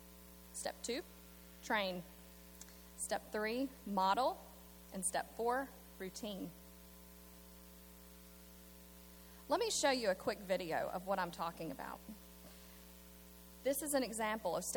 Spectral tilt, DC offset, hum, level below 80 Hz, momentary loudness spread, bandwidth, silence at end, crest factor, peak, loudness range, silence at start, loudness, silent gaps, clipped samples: -3 dB/octave; under 0.1%; none; -64 dBFS; 21 LU; 19.5 kHz; 0 s; 20 dB; -22 dBFS; 8 LU; 0 s; -40 LUFS; none; under 0.1%